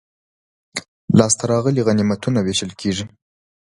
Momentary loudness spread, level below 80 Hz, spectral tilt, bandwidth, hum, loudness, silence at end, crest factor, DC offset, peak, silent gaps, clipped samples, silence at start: 15 LU; -48 dBFS; -5 dB/octave; 11.5 kHz; none; -18 LUFS; 0.7 s; 20 dB; under 0.1%; 0 dBFS; 0.88-1.08 s; under 0.1%; 0.75 s